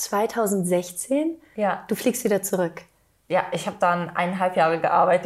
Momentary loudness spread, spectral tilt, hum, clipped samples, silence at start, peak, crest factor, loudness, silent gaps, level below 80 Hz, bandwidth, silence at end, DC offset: 7 LU; -4.5 dB/octave; none; under 0.1%; 0 s; -6 dBFS; 16 dB; -23 LUFS; none; -64 dBFS; 16 kHz; 0 s; under 0.1%